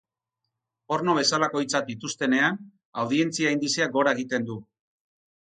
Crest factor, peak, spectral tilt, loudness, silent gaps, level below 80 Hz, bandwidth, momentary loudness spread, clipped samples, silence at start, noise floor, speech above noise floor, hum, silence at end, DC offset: 20 dB; -8 dBFS; -3.5 dB/octave; -25 LUFS; 2.85-2.93 s; -72 dBFS; 9.6 kHz; 11 LU; under 0.1%; 0.9 s; -84 dBFS; 59 dB; none; 0.85 s; under 0.1%